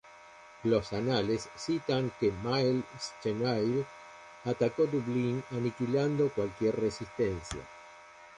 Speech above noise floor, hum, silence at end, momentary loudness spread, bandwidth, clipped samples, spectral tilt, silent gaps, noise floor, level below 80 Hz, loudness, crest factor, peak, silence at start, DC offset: 22 dB; none; 0 s; 15 LU; 11 kHz; under 0.1%; -6.5 dB/octave; none; -53 dBFS; -58 dBFS; -32 LUFS; 16 dB; -14 dBFS; 0.05 s; under 0.1%